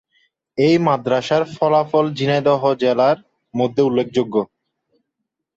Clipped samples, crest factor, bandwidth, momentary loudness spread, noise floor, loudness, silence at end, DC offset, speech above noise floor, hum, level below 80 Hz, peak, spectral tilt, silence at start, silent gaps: under 0.1%; 16 dB; 8 kHz; 7 LU; -79 dBFS; -18 LUFS; 1.1 s; under 0.1%; 62 dB; none; -62 dBFS; -4 dBFS; -7 dB/octave; 0.55 s; none